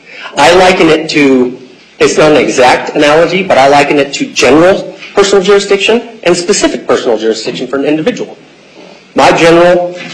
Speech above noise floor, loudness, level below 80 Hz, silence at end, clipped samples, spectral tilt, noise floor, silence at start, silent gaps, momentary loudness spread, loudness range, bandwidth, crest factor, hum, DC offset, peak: 27 dB; -7 LUFS; -40 dBFS; 0 s; 0.3%; -4 dB/octave; -34 dBFS; 0.1 s; none; 10 LU; 4 LU; 12.5 kHz; 8 dB; none; under 0.1%; 0 dBFS